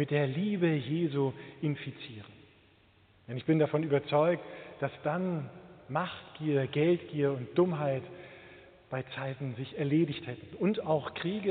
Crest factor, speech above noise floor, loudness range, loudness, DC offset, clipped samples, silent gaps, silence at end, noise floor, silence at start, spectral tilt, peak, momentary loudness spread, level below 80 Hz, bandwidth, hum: 18 dB; 32 dB; 2 LU; -32 LUFS; under 0.1%; under 0.1%; none; 0 s; -63 dBFS; 0 s; -6.5 dB/octave; -14 dBFS; 15 LU; -72 dBFS; 4.6 kHz; none